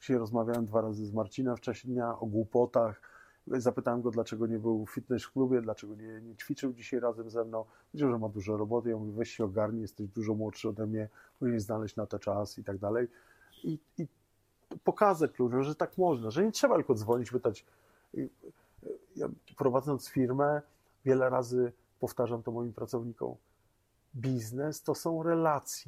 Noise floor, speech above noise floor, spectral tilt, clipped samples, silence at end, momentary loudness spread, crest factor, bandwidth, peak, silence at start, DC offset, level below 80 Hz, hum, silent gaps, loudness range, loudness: -72 dBFS; 40 dB; -6.5 dB/octave; under 0.1%; 0.05 s; 12 LU; 22 dB; 15.5 kHz; -10 dBFS; 0 s; under 0.1%; -70 dBFS; none; none; 5 LU; -33 LUFS